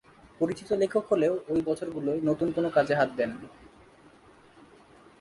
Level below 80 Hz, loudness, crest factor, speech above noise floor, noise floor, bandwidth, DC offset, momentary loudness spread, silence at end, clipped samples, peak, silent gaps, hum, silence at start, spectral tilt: -62 dBFS; -28 LUFS; 18 dB; 29 dB; -56 dBFS; 11.5 kHz; under 0.1%; 7 LU; 1.55 s; under 0.1%; -10 dBFS; none; none; 0.4 s; -7 dB/octave